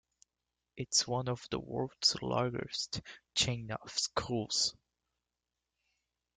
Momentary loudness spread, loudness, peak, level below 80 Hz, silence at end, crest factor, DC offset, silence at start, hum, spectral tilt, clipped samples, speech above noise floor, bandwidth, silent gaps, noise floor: 9 LU; -34 LUFS; -14 dBFS; -64 dBFS; 1.65 s; 24 dB; under 0.1%; 0.75 s; none; -3 dB/octave; under 0.1%; 54 dB; 11 kHz; none; -89 dBFS